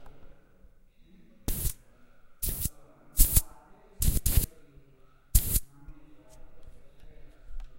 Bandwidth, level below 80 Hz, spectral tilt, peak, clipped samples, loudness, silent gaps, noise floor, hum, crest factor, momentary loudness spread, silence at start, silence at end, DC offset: 16 kHz; -34 dBFS; -3.5 dB/octave; -4 dBFS; under 0.1%; -29 LUFS; none; -56 dBFS; none; 28 dB; 21 LU; 0 s; 0 s; under 0.1%